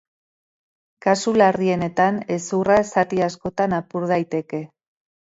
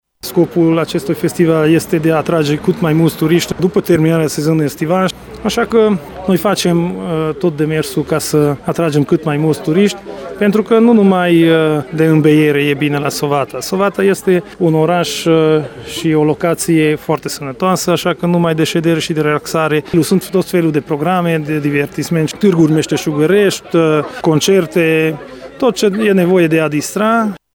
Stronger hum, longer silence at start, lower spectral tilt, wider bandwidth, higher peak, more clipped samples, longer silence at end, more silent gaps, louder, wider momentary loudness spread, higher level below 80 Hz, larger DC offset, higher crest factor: neither; first, 1.05 s vs 0.25 s; about the same, -5.5 dB/octave vs -6 dB/octave; second, 8 kHz vs 17.5 kHz; about the same, -2 dBFS vs 0 dBFS; neither; first, 0.6 s vs 0.2 s; neither; second, -20 LUFS vs -13 LUFS; first, 9 LU vs 6 LU; second, -56 dBFS vs -46 dBFS; neither; first, 20 dB vs 12 dB